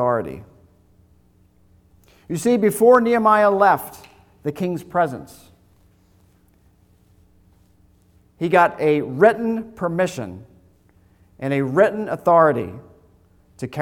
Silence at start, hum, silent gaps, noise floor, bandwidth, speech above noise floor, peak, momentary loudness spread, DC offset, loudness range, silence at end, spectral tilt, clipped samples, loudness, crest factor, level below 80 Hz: 0 s; none; none; -56 dBFS; 19 kHz; 38 dB; -2 dBFS; 18 LU; under 0.1%; 11 LU; 0 s; -6.5 dB/octave; under 0.1%; -18 LUFS; 20 dB; -58 dBFS